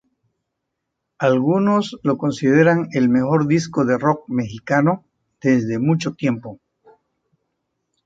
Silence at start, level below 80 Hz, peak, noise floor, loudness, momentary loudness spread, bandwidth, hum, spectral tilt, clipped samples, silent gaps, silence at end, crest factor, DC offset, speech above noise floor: 1.2 s; -60 dBFS; -2 dBFS; -78 dBFS; -19 LUFS; 8 LU; 7.8 kHz; none; -7 dB/octave; under 0.1%; none; 1.5 s; 18 dB; under 0.1%; 60 dB